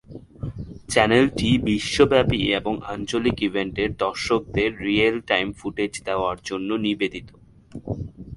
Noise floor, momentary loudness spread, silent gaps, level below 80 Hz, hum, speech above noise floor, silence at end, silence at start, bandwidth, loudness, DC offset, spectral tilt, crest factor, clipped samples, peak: -42 dBFS; 16 LU; none; -44 dBFS; none; 20 dB; 0 s; 0.1 s; 11.5 kHz; -22 LUFS; under 0.1%; -5 dB/octave; 22 dB; under 0.1%; -2 dBFS